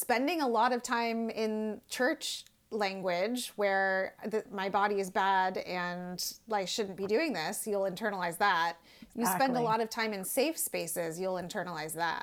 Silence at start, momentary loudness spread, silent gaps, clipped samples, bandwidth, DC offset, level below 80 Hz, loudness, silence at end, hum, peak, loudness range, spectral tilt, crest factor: 0 s; 8 LU; none; under 0.1%; 20 kHz; under 0.1%; -72 dBFS; -32 LUFS; 0 s; none; -16 dBFS; 1 LU; -3.5 dB/octave; 16 dB